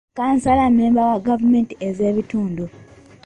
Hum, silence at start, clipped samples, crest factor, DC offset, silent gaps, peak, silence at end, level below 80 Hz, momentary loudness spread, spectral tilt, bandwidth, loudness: none; 0.15 s; under 0.1%; 12 dB; under 0.1%; none; -6 dBFS; 0.4 s; -44 dBFS; 10 LU; -7.5 dB/octave; 9.6 kHz; -18 LUFS